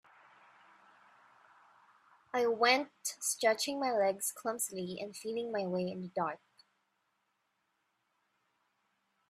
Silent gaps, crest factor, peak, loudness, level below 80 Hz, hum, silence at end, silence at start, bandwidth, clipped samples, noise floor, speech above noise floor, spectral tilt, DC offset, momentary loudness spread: none; 26 dB; -12 dBFS; -34 LUFS; -84 dBFS; none; 2.95 s; 2.35 s; 15.5 kHz; under 0.1%; -81 dBFS; 47 dB; -2.5 dB/octave; under 0.1%; 11 LU